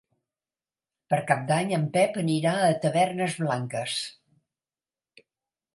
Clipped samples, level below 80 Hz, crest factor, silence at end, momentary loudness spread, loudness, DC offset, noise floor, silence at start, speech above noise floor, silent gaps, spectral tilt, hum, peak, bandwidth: under 0.1%; -74 dBFS; 22 dB; 1.65 s; 6 LU; -26 LUFS; under 0.1%; under -90 dBFS; 1.1 s; over 65 dB; none; -5.5 dB/octave; none; -6 dBFS; 11.5 kHz